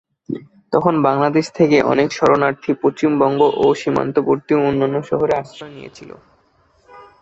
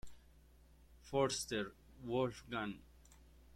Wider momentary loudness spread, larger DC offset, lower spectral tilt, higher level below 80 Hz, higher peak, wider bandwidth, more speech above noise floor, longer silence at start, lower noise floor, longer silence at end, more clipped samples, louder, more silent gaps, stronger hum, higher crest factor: about the same, 15 LU vs 17 LU; neither; first, -6.5 dB/octave vs -4 dB/octave; first, -54 dBFS vs -64 dBFS; first, -2 dBFS vs -22 dBFS; second, 8 kHz vs 16.5 kHz; first, 41 dB vs 25 dB; first, 0.3 s vs 0.05 s; second, -57 dBFS vs -65 dBFS; first, 0.2 s vs 0.05 s; neither; first, -16 LUFS vs -40 LUFS; neither; second, none vs 60 Hz at -65 dBFS; second, 16 dB vs 22 dB